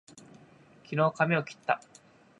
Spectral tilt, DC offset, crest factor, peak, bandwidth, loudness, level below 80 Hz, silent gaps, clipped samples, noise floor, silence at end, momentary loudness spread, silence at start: -6.5 dB/octave; under 0.1%; 22 dB; -10 dBFS; 11 kHz; -29 LUFS; -76 dBFS; none; under 0.1%; -58 dBFS; 0.65 s; 7 LU; 0.9 s